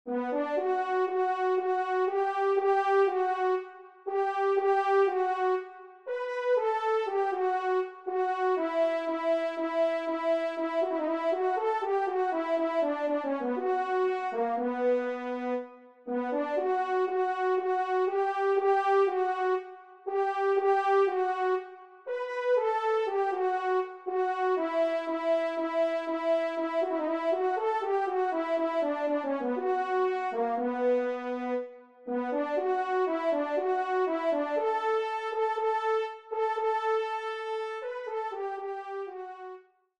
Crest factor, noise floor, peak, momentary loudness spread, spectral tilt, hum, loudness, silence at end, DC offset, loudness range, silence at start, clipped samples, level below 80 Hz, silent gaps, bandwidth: 14 dB; -50 dBFS; -16 dBFS; 9 LU; -4 dB/octave; none; -29 LUFS; 0.4 s; under 0.1%; 3 LU; 0.05 s; under 0.1%; -82 dBFS; none; 8.2 kHz